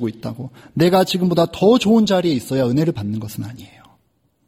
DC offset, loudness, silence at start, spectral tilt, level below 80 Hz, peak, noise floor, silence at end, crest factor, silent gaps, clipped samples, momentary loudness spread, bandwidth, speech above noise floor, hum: under 0.1%; -17 LUFS; 0 s; -6.5 dB/octave; -52 dBFS; -2 dBFS; -64 dBFS; 0.8 s; 16 dB; none; under 0.1%; 15 LU; 16.5 kHz; 46 dB; none